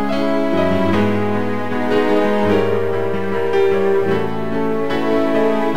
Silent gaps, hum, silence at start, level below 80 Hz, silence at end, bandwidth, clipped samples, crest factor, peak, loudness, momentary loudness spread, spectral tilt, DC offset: none; none; 0 s; -48 dBFS; 0 s; 15.5 kHz; under 0.1%; 14 dB; -2 dBFS; -17 LUFS; 5 LU; -7 dB/octave; 7%